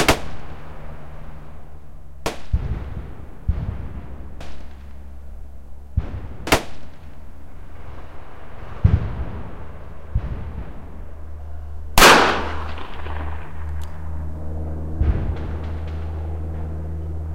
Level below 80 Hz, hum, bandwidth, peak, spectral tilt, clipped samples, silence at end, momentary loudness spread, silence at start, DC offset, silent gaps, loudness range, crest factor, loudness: -30 dBFS; none; 16 kHz; 0 dBFS; -4 dB/octave; under 0.1%; 0 s; 21 LU; 0 s; 3%; none; 13 LU; 24 dB; -22 LUFS